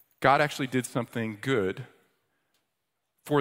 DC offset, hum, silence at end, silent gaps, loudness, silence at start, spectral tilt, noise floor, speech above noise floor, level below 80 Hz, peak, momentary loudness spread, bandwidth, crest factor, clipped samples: under 0.1%; none; 0 s; none; -28 LUFS; 0.2 s; -5.5 dB/octave; -82 dBFS; 55 dB; -68 dBFS; -6 dBFS; 11 LU; 16 kHz; 22 dB; under 0.1%